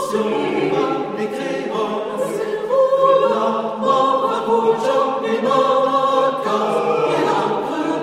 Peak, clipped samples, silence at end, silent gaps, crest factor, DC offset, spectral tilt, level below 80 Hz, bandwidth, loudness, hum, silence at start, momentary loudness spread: -2 dBFS; under 0.1%; 0 s; none; 16 dB; under 0.1%; -5 dB/octave; -66 dBFS; 13.5 kHz; -18 LUFS; none; 0 s; 7 LU